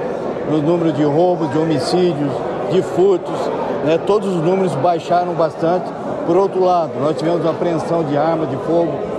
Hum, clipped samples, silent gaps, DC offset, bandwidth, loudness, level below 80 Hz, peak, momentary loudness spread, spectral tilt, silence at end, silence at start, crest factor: none; under 0.1%; none; under 0.1%; 11 kHz; -17 LUFS; -54 dBFS; -2 dBFS; 5 LU; -7 dB/octave; 0 s; 0 s; 14 dB